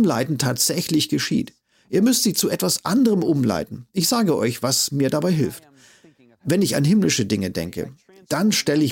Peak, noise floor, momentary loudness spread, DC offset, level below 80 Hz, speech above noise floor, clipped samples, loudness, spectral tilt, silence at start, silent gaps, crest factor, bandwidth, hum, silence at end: -6 dBFS; -53 dBFS; 10 LU; under 0.1%; -56 dBFS; 33 dB; under 0.1%; -20 LUFS; -4.5 dB/octave; 0 s; none; 14 dB; 17 kHz; none; 0 s